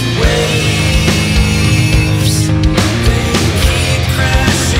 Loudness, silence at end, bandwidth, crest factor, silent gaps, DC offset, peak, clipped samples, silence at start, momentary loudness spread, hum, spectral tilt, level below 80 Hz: -12 LUFS; 0 s; 16.5 kHz; 10 dB; none; under 0.1%; 0 dBFS; under 0.1%; 0 s; 1 LU; none; -4.5 dB/octave; -18 dBFS